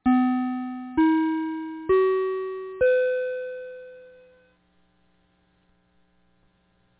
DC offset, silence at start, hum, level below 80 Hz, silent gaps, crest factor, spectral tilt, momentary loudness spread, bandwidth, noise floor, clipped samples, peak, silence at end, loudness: under 0.1%; 0.05 s; none; -58 dBFS; none; 16 dB; -9.5 dB/octave; 15 LU; 4 kHz; -66 dBFS; under 0.1%; -10 dBFS; 2.9 s; -24 LUFS